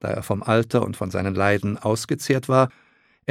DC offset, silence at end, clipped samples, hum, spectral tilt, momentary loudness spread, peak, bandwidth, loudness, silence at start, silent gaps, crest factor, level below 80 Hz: under 0.1%; 0.6 s; under 0.1%; none; -6 dB/octave; 6 LU; -2 dBFS; 16 kHz; -22 LUFS; 0.05 s; none; 20 dB; -56 dBFS